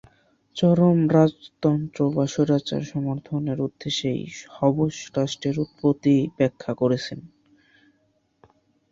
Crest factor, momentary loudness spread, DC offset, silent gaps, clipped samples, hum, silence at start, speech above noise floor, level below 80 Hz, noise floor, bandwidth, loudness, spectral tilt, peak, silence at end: 20 dB; 10 LU; under 0.1%; none; under 0.1%; none; 0.55 s; 45 dB; -58 dBFS; -67 dBFS; 7.6 kHz; -23 LUFS; -7 dB/octave; -4 dBFS; 1.65 s